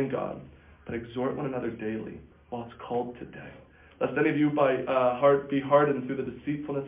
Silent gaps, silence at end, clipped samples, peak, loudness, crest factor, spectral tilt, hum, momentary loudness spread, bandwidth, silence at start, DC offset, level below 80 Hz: none; 0 s; under 0.1%; -10 dBFS; -28 LUFS; 18 dB; -10.5 dB/octave; none; 19 LU; 3.8 kHz; 0 s; under 0.1%; -58 dBFS